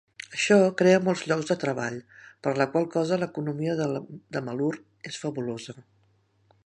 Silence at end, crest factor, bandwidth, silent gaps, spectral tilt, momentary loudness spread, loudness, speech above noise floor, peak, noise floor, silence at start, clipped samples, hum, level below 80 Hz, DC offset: 0.85 s; 20 dB; 11 kHz; none; -5.5 dB/octave; 15 LU; -26 LUFS; 40 dB; -6 dBFS; -66 dBFS; 0.3 s; under 0.1%; none; -72 dBFS; under 0.1%